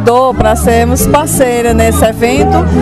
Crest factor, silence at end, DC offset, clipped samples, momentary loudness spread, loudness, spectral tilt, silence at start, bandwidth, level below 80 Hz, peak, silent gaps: 8 dB; 0 s; 1%; 0.4%; 1 LU; -9 LUFS; -5.5 dB/octave; 0 s; 15 kHz; -20 dBFS; 0 dBFS; none